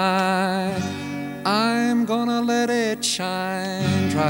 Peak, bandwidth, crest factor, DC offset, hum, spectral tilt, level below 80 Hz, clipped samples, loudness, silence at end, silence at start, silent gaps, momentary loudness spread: -6 dBFS; 18.5 kHz; 16 dB; under 0.1%; none; -4.5 dB/octave; -58 dBFS; under 0.1%; -22 LUFS; 0 s; 0 s; none; 7 LU